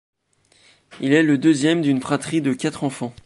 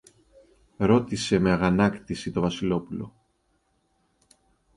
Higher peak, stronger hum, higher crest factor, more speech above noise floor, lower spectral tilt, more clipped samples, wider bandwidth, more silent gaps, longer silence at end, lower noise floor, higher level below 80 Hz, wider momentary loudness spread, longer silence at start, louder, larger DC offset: first, -4 dBFS vs -8 dBFS; neither; about the same, 16 dB vs 18 dB; second, 40 dB vs 46 dB; about the same, -5.5 dB/octave vs -6.5 dB/octave; neither; about the same, 11.5 kHz vs 11.5 kHz; neither; second, 0.15 s vs 1.65 s; second, -60 dBFS vs -70 dBFS; second, -62 dBFS vs -50 dBFS; second, 10 LU vs 13 LU; about the same, 0.9 s vs 0.8 s; first, -20 LUFS vs -24 LUFS; neither